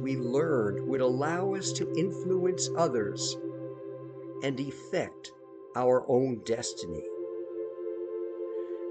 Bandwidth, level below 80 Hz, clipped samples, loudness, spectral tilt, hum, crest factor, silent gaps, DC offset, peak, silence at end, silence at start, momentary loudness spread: 9.2 kHz; -70 dBFS; under 0.1%; -31 LUFS; -5 dB/octave; none; 18 dB; none; under 0.1%; -14 dBFS; 0 s; 0 s; 13 LU